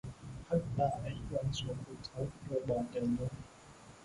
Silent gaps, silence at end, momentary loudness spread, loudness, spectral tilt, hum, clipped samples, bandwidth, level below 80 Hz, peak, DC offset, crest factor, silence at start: none; 0 s; 15 LU; -38 LUFS; -7 dB/octave; none; under 0.1%; 11.5 kHz; -56 dBFS; -20 dBFS; under 0.1%; 18 dB; 0.05 s